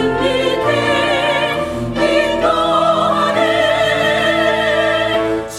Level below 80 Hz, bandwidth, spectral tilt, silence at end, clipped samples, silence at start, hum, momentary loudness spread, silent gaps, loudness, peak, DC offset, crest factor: -40 dBFS; 15 kHz; -4.5 dB/octave; 0 s; under 0.1%; 0 s; none; 3 LU; none; -14 LUFS; -2 dBFS; under 0.1%; 12 dB